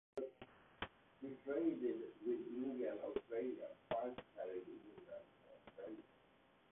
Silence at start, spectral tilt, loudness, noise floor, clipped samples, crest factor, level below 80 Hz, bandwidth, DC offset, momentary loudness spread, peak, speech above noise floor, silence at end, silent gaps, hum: 0.15 s; -3 dB/octave; -47 LUFS; -72 dBFS; under 0.1%; 18 dB; -78 dBFS; 3.8 kHz; under 0.1%; 17 LU; -28 dBFS; 28 dB; 0.65 s; none; none